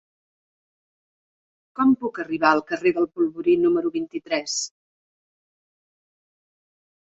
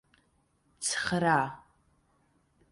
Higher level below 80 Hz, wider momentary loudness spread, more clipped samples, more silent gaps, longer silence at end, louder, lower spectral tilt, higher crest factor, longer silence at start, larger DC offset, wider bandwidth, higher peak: about the same, -66 dBFS vs -66 dBFS; about the same, 8 LU vs 9 LU; neither; neither; first, 2.35 s vs 1.1 s; first, -22 LUFS vs -29 LUFS; about the same, -3.5 dB/octave vs -3.5 dB/octave; about the same, 22 dB vs 22 dB; first, 1.75 s vs 0.8 s; neither; second, 8 kHz vs 11.5 kHz; first, -2 dBFS vs -12 dBFS